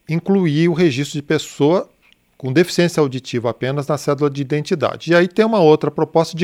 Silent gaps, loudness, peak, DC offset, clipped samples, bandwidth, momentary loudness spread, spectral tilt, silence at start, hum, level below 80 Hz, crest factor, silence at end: none; -17 LUFS; 0 dBFS; under 0.1%; under 0.1%; 16 kHz; 8 LU; -6 dB/octave; 0.1 s; none; -58 dBFS; 16 dB; 0 s